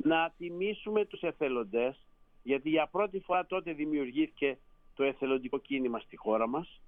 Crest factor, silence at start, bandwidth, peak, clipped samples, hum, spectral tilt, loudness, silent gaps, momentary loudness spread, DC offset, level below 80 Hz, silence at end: 16 dB; 0 s; 3.8 kHz; -16 dBFS; under 0.1%; none; -8.5 dB/octave; -33 LUFS; none; 6 LU; under 0.1%; -62 dBFS; 0 s